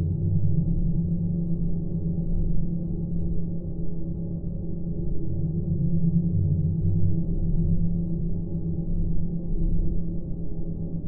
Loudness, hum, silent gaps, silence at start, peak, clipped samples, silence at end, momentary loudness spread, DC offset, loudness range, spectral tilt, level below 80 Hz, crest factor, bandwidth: -28 LUFS; none; none; 0 s; -10 dBFS; under 0.1%; 0 s; 8 LU; 3%; 5 LU; -19 dB/octave; -30 dBFS; 12 dB; 1.1 kHz